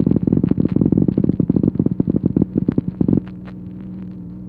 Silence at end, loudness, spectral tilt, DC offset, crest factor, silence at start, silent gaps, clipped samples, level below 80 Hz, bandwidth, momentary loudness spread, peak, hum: 0 s; -18 LUFS; -13.5 dB/octave; under 0.1%; 16 dB; 0 s; none; under 0.1%; -38 dBFS; 4.2 kHz; 16 LU; -2 dBFS; none